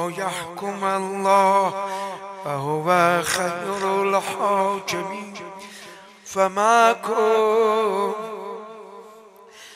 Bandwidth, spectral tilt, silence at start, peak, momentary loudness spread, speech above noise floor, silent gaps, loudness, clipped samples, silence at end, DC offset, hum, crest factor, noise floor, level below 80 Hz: 15.5 kHz; -4 dB/octave; 0 s; -2 dBFS; 20 LU; 25 dB; none; -21 LUFS; under 0.1%; 0 s; under 0.1%; none; 20 dB; -46 dBFS; -68 dBFS